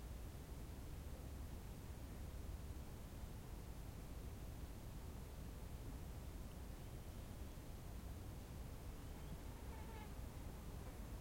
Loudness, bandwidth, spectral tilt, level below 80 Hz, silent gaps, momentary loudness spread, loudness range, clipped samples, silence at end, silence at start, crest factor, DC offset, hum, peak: -54 LUFS; 16.5 kHz; -5.5 dB/octave; -54 dBFS; none; 1 LU; 0 LU; under 0.1%; 0 s; 0 s; 12 dB; under 0.1%; none; -40 dBFS